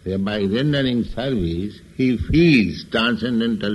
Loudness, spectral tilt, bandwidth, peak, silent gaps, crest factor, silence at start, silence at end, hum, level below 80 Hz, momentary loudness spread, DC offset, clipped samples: -20 LUFS; -7 dB/octave; 11.5 kHz; -4 dBFS; none; 16 dB; 0.05 s; 0 s; none; -36 dBFS; 8 LU; under 0.1%; under 0.1%